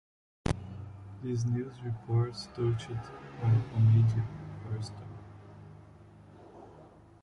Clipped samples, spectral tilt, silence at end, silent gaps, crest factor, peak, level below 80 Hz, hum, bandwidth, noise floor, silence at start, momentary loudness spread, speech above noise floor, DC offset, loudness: under 0.1%; -8 dB/octave; 0.35 s; none; 20 dB; -12 dBFS; -52 dBFS; none; 10.5 kHz; -55 dBFS; 0.45 s; 25 LU; 25 dB; under 0.1%; -32 LUFS